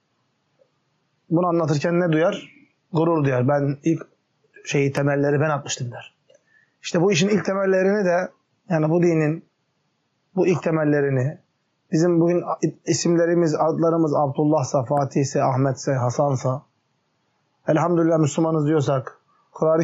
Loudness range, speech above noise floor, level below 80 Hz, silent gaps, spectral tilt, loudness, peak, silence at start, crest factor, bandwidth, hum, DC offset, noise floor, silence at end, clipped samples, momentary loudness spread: 3 LU; 50 dB; -70 dBFS; none; -6.5 dB/octave; -21 LUFS; -8 dBFS; 1.3 s; 12 dB; 8 kHz; none; under 0.1%; -70 dBFS; 0 s; under 0.1%; 9 LU